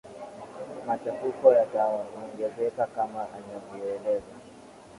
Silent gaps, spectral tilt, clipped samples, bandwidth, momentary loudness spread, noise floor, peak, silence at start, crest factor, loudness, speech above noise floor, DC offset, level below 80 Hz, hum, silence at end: none; -6.5 dB/octave; under 0.1%; 11.5 kHz; 21 LU; -49 dBFS; -6 dBFS; 0.05 s; 22 dB; -28 LUFS; 22 dB; under 0.1%; -68 dBFS; none; 0 s